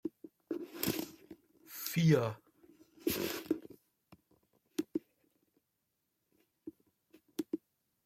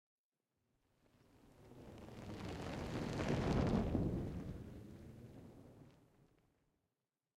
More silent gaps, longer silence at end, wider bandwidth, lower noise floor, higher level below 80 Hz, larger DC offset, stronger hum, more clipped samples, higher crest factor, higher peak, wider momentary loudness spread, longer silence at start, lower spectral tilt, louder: neither; second, 0.5 s vs 1.45 s; about the same, 16.5 kHz vs 15.5 kHz; second, -84 dBFS vs under -90 dBFS; second, -72 dBFS vs -56 dBFS; neither; neither; neither; about the same, 22 dB vs 22 dB; first, -16 dBFS vs -24 dBFS; about the same, 24 LU vs 22 LU; second, 0.05 s vs 1.45 s; second, -5.5 dB/octave vs -7 dB/octave; first, -37 LUFS vs -42 LUFS